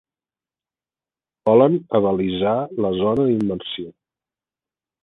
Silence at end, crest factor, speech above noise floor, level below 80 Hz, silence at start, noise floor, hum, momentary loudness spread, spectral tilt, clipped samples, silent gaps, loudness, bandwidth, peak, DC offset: 1.1 s; 20 dB; over 71 dB; -54 dBFS; 1.45 s; under -90 dBFS; none; 13 LU; -9 dB/octave; under 0.1%; none; -19 LUFS; 4.1 kHz; -2 dBFS; under 0.1%